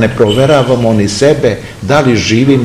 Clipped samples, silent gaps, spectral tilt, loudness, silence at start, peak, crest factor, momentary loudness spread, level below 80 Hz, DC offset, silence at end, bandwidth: 2%; none; -5.5 dB/octave; -9 LUFS; 0 s; 0 dBFS; 8 dB; 4 LU; -36 dBFS; under 0.1%; 0 s; 15 kHz